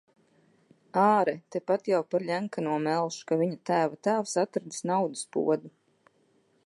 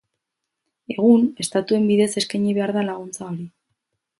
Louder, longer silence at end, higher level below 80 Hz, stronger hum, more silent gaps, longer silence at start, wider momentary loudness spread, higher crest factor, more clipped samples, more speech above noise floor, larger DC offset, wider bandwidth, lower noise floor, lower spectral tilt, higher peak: second, -28 LUFS vs -20 LUFS; first, 0.95 s vs 0.7 s; second, -82 dBFS vs -68 dBFS; neither; neither; about the same, 0.95 s vs 0.9 s; second, 7 LU vs 16 LU; about the same, 20 dB vs 18 dB; neither; second, 40 dB vs 61 dB; neither; about the same, 11.5 kHz vs 11.5 kHz; second, -67 dBFS vs -81 dBFS; about the same, -5.5 dB/octave vs -5.5 dB/octave; second, -10 dBFS vs -4 dBFS